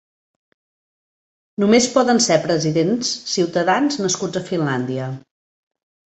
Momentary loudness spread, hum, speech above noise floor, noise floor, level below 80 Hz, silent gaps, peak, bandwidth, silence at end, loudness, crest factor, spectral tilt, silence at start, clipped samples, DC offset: 10 LU; none; over 72 dB; under -90 dBFS; -60 dBFS; none; -2 dBFS; 8.4 kHz; 0.9 s; -18 LUFS; 18 dB; -4 dB/octave; 1.6 s; under 0.1%; under 0.1%